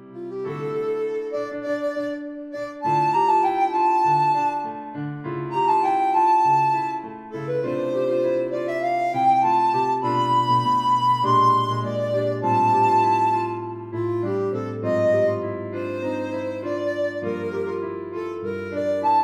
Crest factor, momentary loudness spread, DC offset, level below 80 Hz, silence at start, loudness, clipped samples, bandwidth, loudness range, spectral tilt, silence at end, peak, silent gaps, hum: 14 dB; 12 LU; under 0.1%; -66 dBFS; 0 s; -22 LUFS; under 0.1%; 11 kHz; 5 LU; -7 dB/octave; 0 s; -8 dBFS; none; none